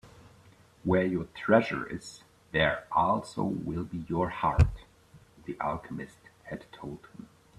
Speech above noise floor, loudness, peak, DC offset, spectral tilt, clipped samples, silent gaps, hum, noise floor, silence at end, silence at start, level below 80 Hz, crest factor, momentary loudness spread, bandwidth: 29 dB; -29 LUFS; -8 dBFS; under 0.1%; -7 dB/octave; under 0.1%; none; none; -58 dBFS; 0.35 s; 0.05 s; -44 dBFS; 22 dB; 20 LU; 12 kHz